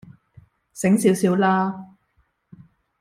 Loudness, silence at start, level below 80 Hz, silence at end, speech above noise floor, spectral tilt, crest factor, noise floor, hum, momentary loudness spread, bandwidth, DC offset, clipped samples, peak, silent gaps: -20 LUFS; 0.75 s; -62 dBFS; 1.15 s; 48 dB; -6 dB/octave; 18 dB; -66 dBFS; none; 17 LU; 15.5 kHz; under 0.1%; under 0.1%; -4 dBFS; none